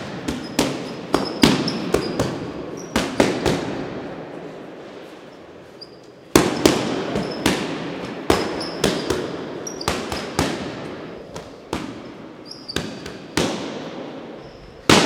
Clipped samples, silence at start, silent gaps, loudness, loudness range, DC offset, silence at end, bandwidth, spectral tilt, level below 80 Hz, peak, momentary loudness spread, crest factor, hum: under 0.1%; 0 s; none; -23 LUFS; 8 LU; under 0.1%; 0 s; 17.5 kHz; -4 dB/octave; -44 dBFS; 0 dBFS; 20 LU; 24 dB; none